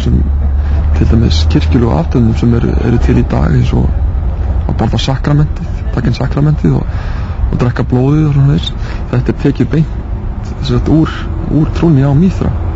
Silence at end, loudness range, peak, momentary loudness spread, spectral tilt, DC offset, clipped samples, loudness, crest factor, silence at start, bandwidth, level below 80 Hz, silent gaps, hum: 0 s; 3 LU; 0 dBFS; 8 LU; -8 dB/octave; under 0.1%; under 0.1%; -12 LUFS; 10 dB; 0 s; 7.8 kHz; -16 dBFS; none; none